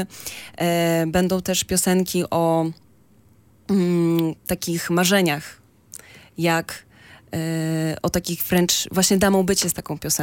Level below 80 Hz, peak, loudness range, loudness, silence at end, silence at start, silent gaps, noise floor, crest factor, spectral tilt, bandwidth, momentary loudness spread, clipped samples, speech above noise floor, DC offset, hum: -50 dBFS; -4 dBFS; 3 LU; -21 LUFS; 0 s; 0 s; none; -55 dBFS; 18 dB; -4 dB/octave; 17 kHz; 16 LU; under 0.1%; 34 dB; under 0.1%; none